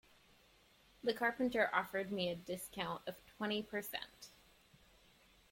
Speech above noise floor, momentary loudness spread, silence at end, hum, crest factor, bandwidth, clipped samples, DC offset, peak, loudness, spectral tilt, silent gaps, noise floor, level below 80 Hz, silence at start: 29 dB; 13 LU; 1.2 s; none; 24 dB; 16.5 kHz; under 0.1%; under 0.1%; -18 dBFS; -40 LUFS; -4 dB/octave; none; -69 dBFS; -72 dBFS; 1.05 s